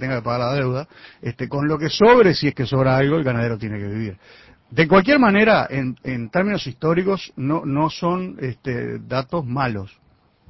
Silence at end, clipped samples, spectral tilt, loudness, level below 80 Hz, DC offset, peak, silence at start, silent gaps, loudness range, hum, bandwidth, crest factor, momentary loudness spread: 0.6 s; under 0.1%; -7 dB/octave; -19 LUFS; -48 dBFS; under 0.1%; -2 dBFS; 0 s; none; 5 LU; none; 6 kHz; 18 dB; 15 LU